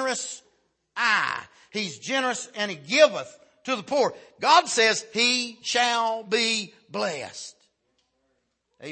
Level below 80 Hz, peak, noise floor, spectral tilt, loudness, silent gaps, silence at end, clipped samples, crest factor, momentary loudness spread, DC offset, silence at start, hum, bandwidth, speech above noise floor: -78 dBFS; -4 dBFS; -74 dBFS; -1.5 dB/octave; -23 LUFS; none; 0 s; under 0.1%; 22 dB; 17 LU; under 0.1%; 0 s; none; 8.8 kHz; 49 dB